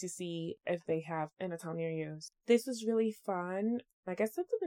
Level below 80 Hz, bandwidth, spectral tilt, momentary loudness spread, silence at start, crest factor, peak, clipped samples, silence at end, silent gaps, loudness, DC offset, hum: -82 dBFS; 17 kHz; -5.5 dB/octave; 9 LU; 0 s; 20 dB; -16 dBFS; under 0.1%; 0 s; 3.93-4.03 s; -36 LUFS; under 0.1%; none